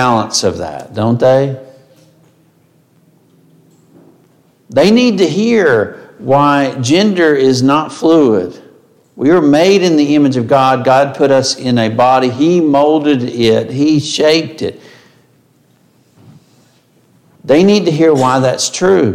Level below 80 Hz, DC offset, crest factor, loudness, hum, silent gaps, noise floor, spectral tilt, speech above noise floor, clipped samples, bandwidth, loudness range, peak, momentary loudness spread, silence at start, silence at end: -54 dBFS; under 0.1%; 12 dB; -11 LUFS; none; none; -51 dBFS; -5 dB/octave; 41 dB; under 0.1%; 14 kHz; 8 LU; 0 dBFS; 8 LU; 0 s; 0 s